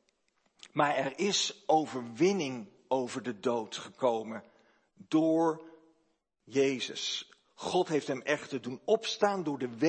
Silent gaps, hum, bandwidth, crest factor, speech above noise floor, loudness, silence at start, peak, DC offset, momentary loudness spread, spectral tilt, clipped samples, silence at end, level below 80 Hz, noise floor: none; none; 8.8 kHz; 20 dB; 45 dB; -31 LUFS; 0.75 s; -12 dBFS; under 0.1%; 10 LU; -4 dB/octave; under 0.1%; 0 s; -82 dBFS; -76 dBFS